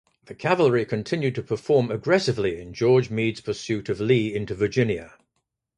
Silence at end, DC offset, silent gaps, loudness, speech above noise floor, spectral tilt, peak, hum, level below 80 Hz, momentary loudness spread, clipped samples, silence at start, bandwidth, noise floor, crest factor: 0.7 s; under 0.1%; none; -24 LUFS; 55 dB; -6.5 dB/octave; -6 dBFS; none; -54 dBFS; 8 LU; under 0.1%; 0.3 s; 10.5 kHz; -77 dBFS; 18 dB